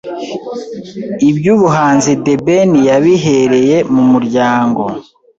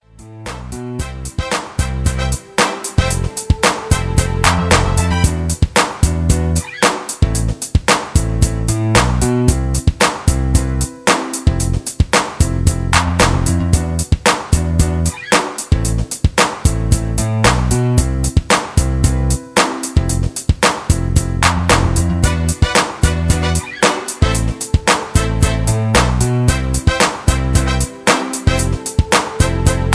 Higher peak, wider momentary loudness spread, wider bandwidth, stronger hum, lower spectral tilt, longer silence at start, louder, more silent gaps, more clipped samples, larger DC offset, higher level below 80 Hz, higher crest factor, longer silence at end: about the same, 0 dBFS vs 0 dBFS; first, 14 LU vs 5 LU; second, 8 kHz vs 11 kHz; neither; first, -6 dB/octave vs -4.5 dB/octave; second, 0.05 s vs 0.2 s; first, -10 LUFS vs -15 LUFS; neither; neither; neither; second, -50 dBFS vs -20 dBFS; about the same, 10 dB vs 14 dB; first, 0.35 s vs 0 s